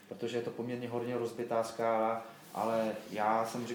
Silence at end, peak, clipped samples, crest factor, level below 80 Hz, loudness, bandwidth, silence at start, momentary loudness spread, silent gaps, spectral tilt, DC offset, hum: 0 s; -18 dBFS; under 0.1%; 18 dB; -84 dBFS; -35 LUFS; 19 kHz; 0 s; 7 LU; none; -5.5 dB/octave; under 0.1%; none